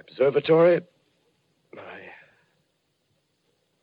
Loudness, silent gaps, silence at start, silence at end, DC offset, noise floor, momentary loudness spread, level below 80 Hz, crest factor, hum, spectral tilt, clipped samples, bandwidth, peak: -21 LUFS; none; 0.2 s; 1.85 s; under 0.1%; -72 dBFS; 25 LU; -78 dBFS; 18 dB; none; -9 dB/octave; under 0.1%; 5 kHz; -8 dBFS